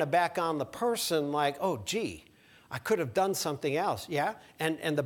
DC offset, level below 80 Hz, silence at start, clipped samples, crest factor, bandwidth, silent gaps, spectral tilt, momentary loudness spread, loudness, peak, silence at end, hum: under 0.1%; -66 dBFS; 0 s; under 0.1%; 18 dB; 19 kHz; none; -4 dB/octave; 6 LU; -31 LUFS; -12 dBFS; 0 s; none